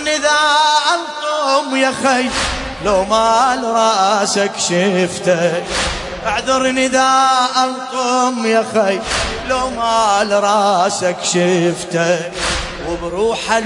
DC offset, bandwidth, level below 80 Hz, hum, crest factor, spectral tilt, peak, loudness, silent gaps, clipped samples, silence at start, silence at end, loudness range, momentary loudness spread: under 0.1%; 11 kHz; -38 dBFS; none; 14 dB; -3 dB/octave; 0 dBFS; -15 LUFS; none; under 0.1%; 0 s; 0 s; 1 LU; 7 LU